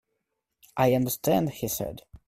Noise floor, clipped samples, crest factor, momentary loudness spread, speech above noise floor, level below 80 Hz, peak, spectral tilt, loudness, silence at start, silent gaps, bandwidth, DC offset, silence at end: -81 dBFS; under 0.1%; 20 dB; 11 LU; 55 dB; -56 dBFS; -8 dBFS; -5.5 dB/octave; -26 LUFS; 0.75 s; none; 16 kHz; under 0.1%; 0.3 s